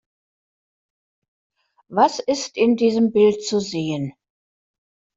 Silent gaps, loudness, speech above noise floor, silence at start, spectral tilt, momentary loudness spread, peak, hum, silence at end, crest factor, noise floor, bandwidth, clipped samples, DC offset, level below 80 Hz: none; -20 LUFS; over 71 dB; 1.9 s; -5 dB/octave; 10 LU; -4 dBFS; none; 1.05 s; 18 dB; under -90 dBFS; 7.8 kHz; under 0.1%; under 0.1%; -66 dBFS